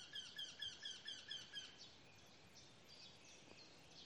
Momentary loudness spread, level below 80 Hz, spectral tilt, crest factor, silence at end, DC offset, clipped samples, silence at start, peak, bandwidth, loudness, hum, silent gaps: 14 LU; -86 dBFS; -0.5 dB/octave; 20 dB; 0 s; under 0.1%; under 0.1%; 0 s; -38 dBFS; 12 kHz; -53 LUFS; none; none